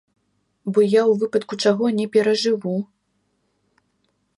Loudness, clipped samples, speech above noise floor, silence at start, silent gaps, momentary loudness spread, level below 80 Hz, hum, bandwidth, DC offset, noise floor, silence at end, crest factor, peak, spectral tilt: -20 LUFS; under 0.1%; 51 dB; 0.65 s; none; 11 LU; -72 dBFS; none; 11.5 kHz; under 0.1%; -69 dBFS; 1.55 s; 16 dB; -6 dBFS; -5.5 dB/octave